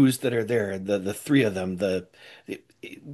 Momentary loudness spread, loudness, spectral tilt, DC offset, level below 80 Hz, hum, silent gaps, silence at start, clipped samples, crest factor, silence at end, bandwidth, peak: 20 LU; -25 LUFS; -6 dB/octave; under 0.1%; -70 dBFS; none; none; 0 s; under 0.1%; 16 dB; 0 s; 12.5 kHz; -8 dBFS